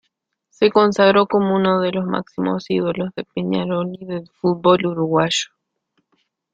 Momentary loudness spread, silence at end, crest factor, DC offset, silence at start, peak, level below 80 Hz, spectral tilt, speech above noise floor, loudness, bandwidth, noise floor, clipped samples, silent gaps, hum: 12 LU; 1.1 s; 18 dB; under 0.1%; 0.6 s; -2 dBFS; -58 dBFS; -5.5 dB/octave; 54 dB; -18 LUFS; 9.2 kHz; -72 dBFS; under 0.1%; none; none